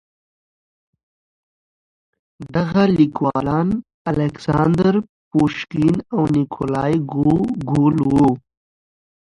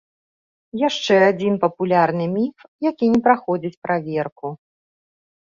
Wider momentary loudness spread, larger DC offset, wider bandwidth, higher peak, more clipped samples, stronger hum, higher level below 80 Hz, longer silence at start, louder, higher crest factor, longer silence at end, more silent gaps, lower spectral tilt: second, 7 LU vs 11 LU; neither; first, 11 kHz vs 7.4 kHz; about the same, -2 dBFS vs -2 dBFS; neither; neither; first, -46 dBFS vs -62 dBFS; first, 2.4 s vs 0.75 s; about the same, -18 LUFS vs -20 LUFS; about the same, 16 dB vs 18 dB; about the same, 1 s vs 1.05 s; first, 3.94-4.05 s, 5.09-5.31 s vs 2.68-2.79 s, 3.77-3.82 s, 4.32-4.36 s; first, -8.5 dB/octave vs -6 dB/octave